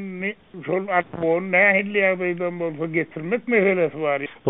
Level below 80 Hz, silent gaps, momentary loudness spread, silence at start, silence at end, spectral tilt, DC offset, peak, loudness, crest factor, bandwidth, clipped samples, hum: -64 dBFS; none; 11 LU; 0 s; 0 s; -4.5 dB/octave; 0.2%; -4 dBFS; -21 LUFS; 18 dB; 4 kHz; under 0.1%; none